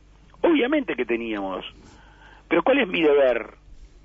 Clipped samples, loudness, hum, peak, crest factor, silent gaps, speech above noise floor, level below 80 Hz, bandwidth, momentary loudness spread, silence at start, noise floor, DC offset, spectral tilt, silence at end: under 0.1%; -22 LUFS; none; -8 dBFS; 16 dB; none; 27 dB; -52 dBFS; 7.2 kHz; 13 LU; 0.45 s; -49 dBFS; under 0.1%; -6.5 dB/octave; 0.2 s